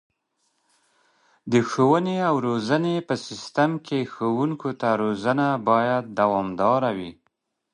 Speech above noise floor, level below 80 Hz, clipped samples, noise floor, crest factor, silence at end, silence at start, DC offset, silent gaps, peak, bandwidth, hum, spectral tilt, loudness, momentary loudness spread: 51 dB; -64 dBFS; under 0.1%; -73 dBFS; 20 dB; 0.6 s; 1.45 s; under 0.1%; none; -4 dBFS; 10.5 kHz; none; -6.5 dB/octave; -23 LUFS; 8 LU